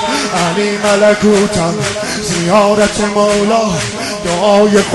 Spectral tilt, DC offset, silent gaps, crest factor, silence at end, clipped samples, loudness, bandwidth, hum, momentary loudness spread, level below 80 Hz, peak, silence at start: -4 dB/octave; under 0.1%; none; 12 dB; 0 s; under 0.1%; -12 LUFS; 12 kHz; none; 7 LU; -38 dBFS; 0 dBFS; 0 s